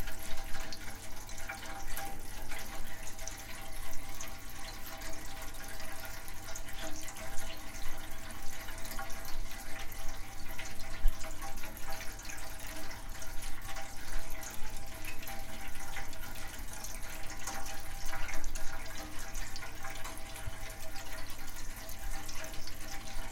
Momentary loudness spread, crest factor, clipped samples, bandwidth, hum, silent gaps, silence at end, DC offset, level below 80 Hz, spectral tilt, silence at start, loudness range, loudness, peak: 3 LU; 18 dB; under 0.1%; 16.5 kHz; none; none; 0 s; under 0.1%; -40 dBFS; -2.5 dB/octave; 0 s; 2 LU; -44 LUFS; -12 dBFS